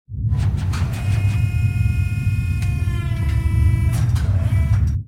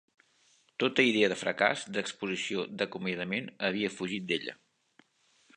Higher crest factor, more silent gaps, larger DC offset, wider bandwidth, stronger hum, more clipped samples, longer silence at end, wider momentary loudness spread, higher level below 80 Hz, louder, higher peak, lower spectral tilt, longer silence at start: second, 12 dB vs 24 dB; neither; first, 0.3% vs under 0.1%; first, 13.5 kHz vs 11 kHz; neither; neither; second, 0 s vs 1.05 s; second, 4 LU vs 9 LU; first, -24 dBFS vs -74 dBFS; first, -20 LUFS vs -31 LUFS; about the same, -6 dBFS vs -8 dBFS; first, -7 dB/octave vs -4 dB/octave; second, 0.1 s vs 0.8 s